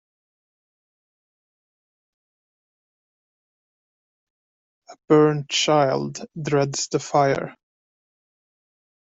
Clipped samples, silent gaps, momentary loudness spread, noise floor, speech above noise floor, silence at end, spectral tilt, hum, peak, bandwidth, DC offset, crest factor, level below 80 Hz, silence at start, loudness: under 0.1%; none; 12 LU; under -90 dBFS; over 69 dB; 1.6 s; -4.5 dB/octave; none; -6 dBFS; 8 kHz; under 0.1%; 20 dB; -68 dBFS; 4.9 s; -21 LUFS